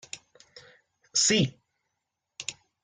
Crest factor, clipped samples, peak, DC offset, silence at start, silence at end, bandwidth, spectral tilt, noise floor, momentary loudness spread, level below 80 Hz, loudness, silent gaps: 20 dB; under 0.1%; -12 dBFS; under 0.1%; 0.15 s; 0.3 s; 10.5 kHz; -2.5 dB/octave; -83 dBFS; 20 LU; -68 dBFS; -26 LUFS; none